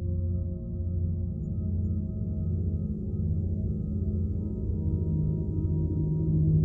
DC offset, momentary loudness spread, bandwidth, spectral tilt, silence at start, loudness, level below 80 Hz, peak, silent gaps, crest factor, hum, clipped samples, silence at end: under 0.1%; 4 LU; 1.3 kHz; -14.5 dB/octave; 0 s; -30 LUFS; -38 dBFS; -14 dBFS; none; 14 dB; none; under 0.1%; 0 s